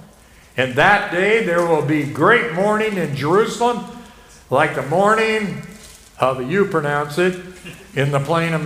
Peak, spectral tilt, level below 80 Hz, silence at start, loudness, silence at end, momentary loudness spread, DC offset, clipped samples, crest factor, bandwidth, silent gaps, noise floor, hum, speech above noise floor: 0 dBFS; -5.5 dB/octave; -50 dBFS; 0.55 s; -17 LUFS; 0 s; 13 LU; under 0.1%; under 0.1%; 18 dB; 15.5 kHz; none; -47 dBFS; none; 29 dB